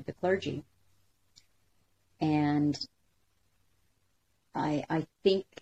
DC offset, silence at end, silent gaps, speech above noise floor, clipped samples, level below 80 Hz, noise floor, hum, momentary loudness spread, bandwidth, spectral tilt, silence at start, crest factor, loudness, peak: under 0.1%; 0.2 s; none; 45 dB; under 0.1%; -70 dBFS; -75 dBFS; none; 12 LU; 8.4 kHz; -7 dB/octave; 0 s; 20 dB; -31 LUFS; -12 dBFS